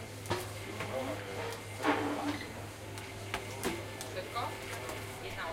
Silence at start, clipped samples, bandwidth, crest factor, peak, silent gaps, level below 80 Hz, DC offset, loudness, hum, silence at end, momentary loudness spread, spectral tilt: 0 s; under 0.1%; 16.5 kHz; 22 dB; -16 dBFS; none; -60 dBFS; under 0.1%; -38 LUFS; none; 0 s; 10 LU; -4.5 dB/octave